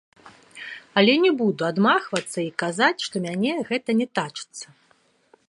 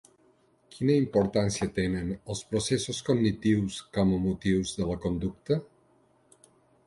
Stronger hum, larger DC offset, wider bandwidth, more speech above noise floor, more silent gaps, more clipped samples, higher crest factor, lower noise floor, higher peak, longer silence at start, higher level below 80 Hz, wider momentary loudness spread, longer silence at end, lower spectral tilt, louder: neither; neither; about the same, 11.5 kHz vs 11.5 kHz; about the same, 40 dB vs 37 dB; neither; neither; about the same, 22 dB vs 18 dB; about the same, -62 dBFS vs -64 dBFS; first, -2 dBFS vs -12 dBFS; second, 0.25 s vs 0.75 s; second, -72 dBFS vs -50 dBFS; first, 19 LU vs 6 LU; second, 0.85 s vs 1.2 s; second, -4.5 dB/octave vs -6 dB/octave; first, -22 LUFS vs -28 LUFS